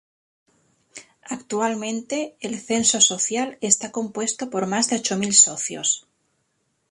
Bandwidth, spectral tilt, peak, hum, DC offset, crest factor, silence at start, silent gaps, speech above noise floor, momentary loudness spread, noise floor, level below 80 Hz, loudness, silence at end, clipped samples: 11.5 kHz; -1.5 dB/octave; 0 dBFS; none; under 0.1%; 24 dB; 0.95 s; none; 49 dB; 14 LU; -71 dBFS; -68 dBFS; -20 LUFS; 0.9 s; under 0.1%